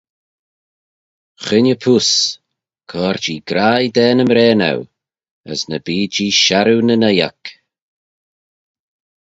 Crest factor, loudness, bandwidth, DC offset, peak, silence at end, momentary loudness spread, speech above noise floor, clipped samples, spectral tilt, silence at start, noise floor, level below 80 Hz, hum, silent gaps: 16 dB; -14 LUFS; 8 kHz; under 0.1%; 0 dBFS; 1.7 s; 13 LU; over 76 dB; under 0.1%; -4 dB/octave; 1.4 s; under -90 dBFS; -56 dBFS; none; 5.31-5.44 s